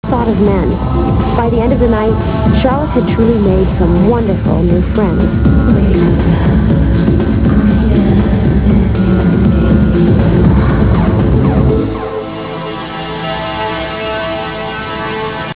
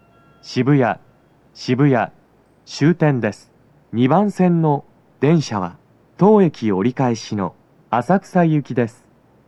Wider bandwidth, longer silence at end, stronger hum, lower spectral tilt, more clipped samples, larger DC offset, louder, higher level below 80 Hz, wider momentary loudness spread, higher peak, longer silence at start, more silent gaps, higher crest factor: second, 4 kHz vs 10.5 kHz; second, 0 s vs 0.6 s; neither; first, -12 dB/octave vs -7.5 dB/octave; first, 0.1% vs under 0.1%; first, 0.4% vs under 0.1%; first, -12 LUFS vs -18 LUFS; first, -18 dBFS vs -64 dBFS; about the same, 9 LU vs 11 LU; about the same, 0 dBFS vs 0 dBFS; second, 0.05 s vs 0.45 s; neither; second, 10 dB vs 18 dB